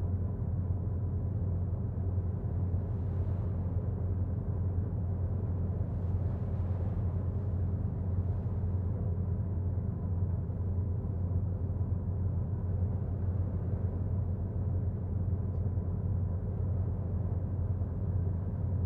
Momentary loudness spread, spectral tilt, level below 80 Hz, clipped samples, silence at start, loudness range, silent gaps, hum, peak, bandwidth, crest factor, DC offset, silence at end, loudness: 1 LU; -13 dB/octave; -42 dBFS; under 0.1%; 0 s; 0 LU; none; none; -20 dBFS; 2 kHz; 12 dB; under 0.1%; 0 s; -34 LUFS